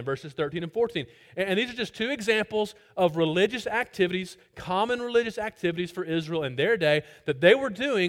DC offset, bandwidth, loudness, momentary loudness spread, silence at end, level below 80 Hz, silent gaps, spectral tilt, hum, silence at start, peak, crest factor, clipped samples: under 0.1%; 16 kHz; -26 LUFS; 10 LU; 0 s; -62 dBFS; none; -5.5 dB/octave; none; 0 s; -6 dBFS; 20 dB; under 0.1%